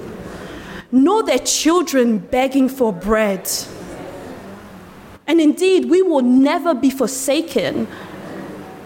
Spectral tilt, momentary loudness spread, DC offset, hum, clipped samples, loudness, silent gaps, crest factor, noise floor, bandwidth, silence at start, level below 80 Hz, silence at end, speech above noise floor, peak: -4 dB/octave; 19 LU; under 0.1%; none; under 0.1%; -16 LUFS; none; 14 dB; -39 dBFS; 17 kHz; 0 s; -46 dBFS; 0 s; 24 dB; -4 dBFS